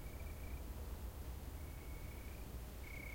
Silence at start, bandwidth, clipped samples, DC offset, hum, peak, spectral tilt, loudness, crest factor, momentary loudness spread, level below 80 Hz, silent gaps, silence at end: 0 s; 16.5 kHz; under 0.1%; under 0.1%; none; -36 dBFS; -5.5 dB/octave; -51 LUFS; 12 dB; 2 LU; -50 dBFS; none; 0 s